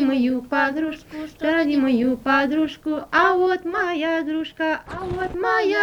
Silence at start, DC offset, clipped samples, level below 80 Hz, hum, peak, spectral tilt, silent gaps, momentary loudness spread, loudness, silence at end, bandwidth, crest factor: 0 s; under 0.1%; under 0.1%; -50 dBFS; none; -4 dBFS; -5.5 dB/octave; none; 9 LU; -21 LUFS; 0 s; 19 kHz; 16 dB